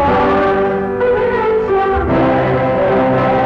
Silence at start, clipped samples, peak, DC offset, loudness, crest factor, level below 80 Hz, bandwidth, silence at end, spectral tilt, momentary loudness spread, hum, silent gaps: 0 s; under 0.1%; -6 dBFS; under 0.1%; -14 LUFS; 6 dB; -32 dBFS; 6.6 kHz; 0 s; -8.5 dB/octave; 2 LU; none; none